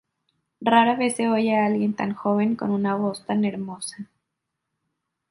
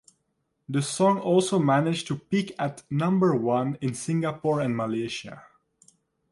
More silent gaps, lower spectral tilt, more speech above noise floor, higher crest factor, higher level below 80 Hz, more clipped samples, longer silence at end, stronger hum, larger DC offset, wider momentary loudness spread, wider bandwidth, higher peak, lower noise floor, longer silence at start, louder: neither; about the same, -5.5 dB/octave vs -6 dB/octave; first, 59 dB vs 51 dB; about the same, 20 dB vs 18 dB; about the same, -68 dBFS vs -66 dBFS; neither; first, 1.25 s vs 0.9 s; neither; neither; first, 14 LU vs 9 LU; about the same, 11.5 kHz vs 11.5 kHz; first, -4 dBFS vs -8 dBFS; first, -81 dBFS vs -76 dBFS; about the same, 0.6 s vs 0.7 s; first, -23 LUFS vs -26 LUFS